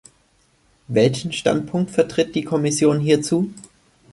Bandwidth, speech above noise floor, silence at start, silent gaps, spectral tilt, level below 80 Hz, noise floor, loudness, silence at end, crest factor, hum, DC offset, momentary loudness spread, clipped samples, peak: 11.5 kHz; 41 dB; 0.9 s; none; -5.5 dB/octave; -56 dBFS; -60 dBFS; -20 LUFS; 0.55 s; 18 dB; none; under 0.1%; 5 LU; under 0.1%; -2 dBFS